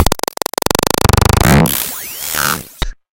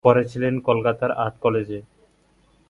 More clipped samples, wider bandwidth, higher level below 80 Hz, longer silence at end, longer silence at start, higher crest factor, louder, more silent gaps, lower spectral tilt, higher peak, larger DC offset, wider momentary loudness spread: neither; first, over 20 kHz vs 7.6 kHz; first, -24 dBFS vs -56 dBFS; second, 0.25 s vs 0.9 s; about the same, 0 s vs 0.05 s; second, 14 dB vs 22 dB; first, -13 LUFS vs -22 LUFS; neither; second, -4 dB/octave vs -8 dB/octave; about the same, 0 dBFS vs 0 dBFS; neither; about the same, 11 LU vs 9 LU